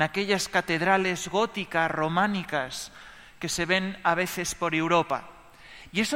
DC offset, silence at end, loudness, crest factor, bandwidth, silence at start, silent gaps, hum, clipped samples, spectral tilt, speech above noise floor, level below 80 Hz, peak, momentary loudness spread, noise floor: under 0.1%; 0 s; -26 LUFS; 20 dB; 16.5 kHz; 0 s; none; none; under 0.1%; -3.5 dB/octave; 22 dB; -56 dBFS; -6 dBFS; 10 LU; -48 dBFS